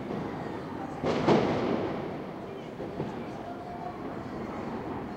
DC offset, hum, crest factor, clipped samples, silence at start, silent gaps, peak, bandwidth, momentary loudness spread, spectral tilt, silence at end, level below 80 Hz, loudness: under 0.1%; none; 22 dB; under 0.1%; 0 s; none; -10 dBFS; 15.5 kHz; 14 LU; -7 dB/octave; 0 s; -56 dBFS; -33 LUFS